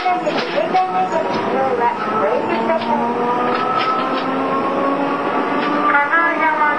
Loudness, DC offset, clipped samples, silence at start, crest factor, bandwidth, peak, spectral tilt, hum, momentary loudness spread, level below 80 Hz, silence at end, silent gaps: -17 LUFS; 0.5%; under 0.1%; 0 s; 14 dB; 10.5 kHz; -2 dBFS; -5.5 dB/octave; none; 4 LU; -62 dBFS; 0 s; none